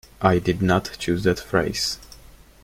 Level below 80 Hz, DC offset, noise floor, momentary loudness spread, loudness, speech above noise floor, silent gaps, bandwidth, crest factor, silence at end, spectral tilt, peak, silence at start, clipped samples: -44 dBFS; under 0.1%; -47 dBFS; 6 LU; -22 LUFS; 26 dB; none; 16.5 kHz; 20 dB; 0.45 s; -5 dB/octave; -2 dBFS; 0.2 s; under 0.1%